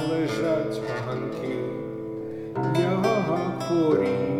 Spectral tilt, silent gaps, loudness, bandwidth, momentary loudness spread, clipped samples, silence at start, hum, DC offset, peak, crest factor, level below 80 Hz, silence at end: -7 dB/octave; none; -26 LUFS; 14.5 kHz; 11 LU; under 0.1%; 0 s; none; 0.1%; -10 dBFS; 16 dB; -60 dBFS; 0 s